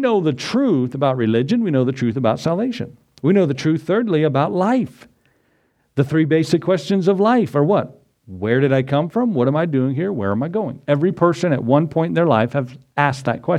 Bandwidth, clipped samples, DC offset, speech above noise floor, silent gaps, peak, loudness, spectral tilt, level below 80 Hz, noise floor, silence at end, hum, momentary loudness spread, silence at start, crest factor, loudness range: 11.5 kHz; under 0.1%; under 0.1%; 45 dB; none; 0 dBFS; -18 LUFS; -7.5 dB/octave; -60 dBFS; -63 dBFS; 0 s; none; 6 LU; 0 s; 18 dB; 2 LU